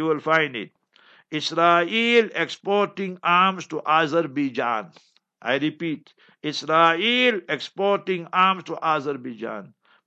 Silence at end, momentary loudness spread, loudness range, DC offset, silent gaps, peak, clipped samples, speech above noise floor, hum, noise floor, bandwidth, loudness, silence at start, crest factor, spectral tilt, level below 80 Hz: 0.4 s; 14 LU; 3 LU; under 0.1%; none; -4 dBFS; under 0.1%; 33 dB; none; -56 dBFS; 8.4 kHz; -22 LUFS; 0 s; 20 dB; -4.5 dB/octave; -78 dBFS